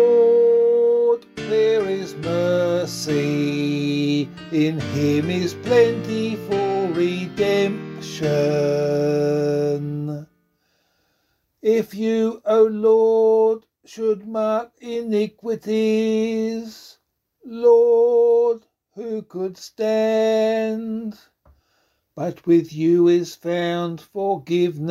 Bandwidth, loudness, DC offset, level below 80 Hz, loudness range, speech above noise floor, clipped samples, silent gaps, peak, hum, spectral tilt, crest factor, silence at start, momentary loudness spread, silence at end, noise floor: 13.5 kHz; -20 LUFS; under 0.1%; -60 dBFS; 5 LU; 50 dB; under 0.1%; none; -4 dBFS; none; -6.5 dB/octave; 16 dB; 0 s; 13 LU; 0 s; -69 dBFS